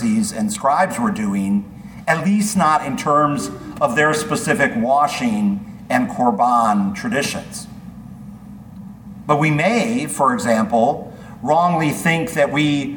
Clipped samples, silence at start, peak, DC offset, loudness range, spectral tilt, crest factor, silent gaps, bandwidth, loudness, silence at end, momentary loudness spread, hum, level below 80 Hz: under 0.1%; 0 s; -2 dBFS; under 0.1%; 4 LU; -5 dB/octave; 16 dB; none; 19 kHz; -18 LUFS; 0 s; 20 LU; none; -50 dBFS